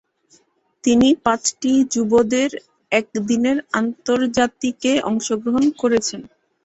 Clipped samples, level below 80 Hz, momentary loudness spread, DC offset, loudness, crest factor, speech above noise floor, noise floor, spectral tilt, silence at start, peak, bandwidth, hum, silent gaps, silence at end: under 0.1%; -54 dBFS; 6 LU; under 0.1%; -19 LUFS; 16 dB; 40 dB; -58 dBFS; -3.5 dB/octave; 0.85 s; -2 dBFS; 8.2 kHz; none; none; 0.4 s